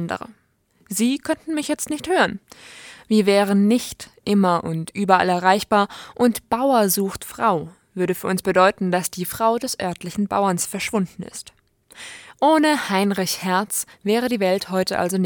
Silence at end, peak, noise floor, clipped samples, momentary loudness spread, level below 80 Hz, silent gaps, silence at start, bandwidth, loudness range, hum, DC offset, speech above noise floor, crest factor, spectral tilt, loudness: 0 s; -2 dBFS; -62 dBFS; under 0.1%; 14 LU; -58 dBFS; none; 0 s; 19 kHz; 4 LU; none; under 0.1%; 42 dB; 20 dB; -4.5 dB/octave; -20 LUFS